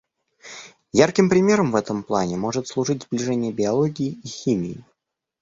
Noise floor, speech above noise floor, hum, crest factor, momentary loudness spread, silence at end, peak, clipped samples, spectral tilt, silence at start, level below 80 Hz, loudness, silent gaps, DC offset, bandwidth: -77 dBFS; 57 dB; none; 20 dB; 19 LU; 0.6 s; -2 dBFS; under 0.1%; -5.5 dB/octave; 0.45 s; -56 dBFS; -22 LUFS; none; under 0.1%; 7.8 kHz